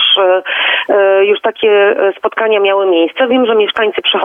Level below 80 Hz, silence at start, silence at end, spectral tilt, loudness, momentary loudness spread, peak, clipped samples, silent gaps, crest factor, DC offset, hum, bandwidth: -60 dBFS; 0 s; 0 s; -5 dB/octave; -11 LUFS; 3 LU; 0 dBFS; under 0.1%; none; 10 dB; under 0.1%; none; 3.8 kHz